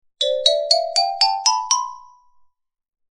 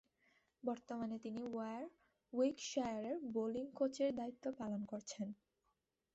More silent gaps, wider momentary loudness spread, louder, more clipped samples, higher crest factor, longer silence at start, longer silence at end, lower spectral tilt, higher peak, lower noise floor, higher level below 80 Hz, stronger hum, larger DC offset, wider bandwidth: neither; second, 5 LU vs 9 LU; first, -17 LUFS vs -43 LUFS; neither; about the same, 22 dB vs 18 dB; second, 0.2 s vs 0.65 s; first, 1.1 s vs 0.8 s; second, 5.5 dB/octave vs -5 dB/octave; first, 0 dBFS vs -26 dBFS; second, -57 dBFS vs -86 dBFS; first, -70 dBFS vs -80 dBFS; neither; neither; first, 12.5 kHz vs 8.2 kHz